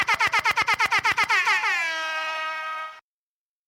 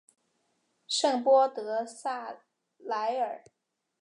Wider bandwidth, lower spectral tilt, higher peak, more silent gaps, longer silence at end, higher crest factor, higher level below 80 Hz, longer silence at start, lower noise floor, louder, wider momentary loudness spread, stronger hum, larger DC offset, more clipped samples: first, 16.5 kHz vs 11 kHz; about the same, -0.5 dB/octave vs -1.5 dB/octave; about the same, -12 dBFS vs -12 dBFS; neither; about the same, 0.7 s vs 0.65 s; about the same, 14 dB vs 18 dB; first, -62 dBFS vs under -90 dBFS; second, 0 s vs 0.9 s; first, under -90 dBFS vs -75 dBFS; first, -22 LUFS vs -29 LUFS; second, 11 LU vs 21 LU; neither; neither; neither